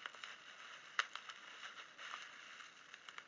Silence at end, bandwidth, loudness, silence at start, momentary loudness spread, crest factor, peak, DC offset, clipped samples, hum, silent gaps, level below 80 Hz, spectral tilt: 0 s; 7.8 kHz; -49 LUFS; 0 s; 12 LU; 32 dB; -18 dBFS; under 0.1%; under 0.1%; none; none; under -90 dBFS; 1 dB/octave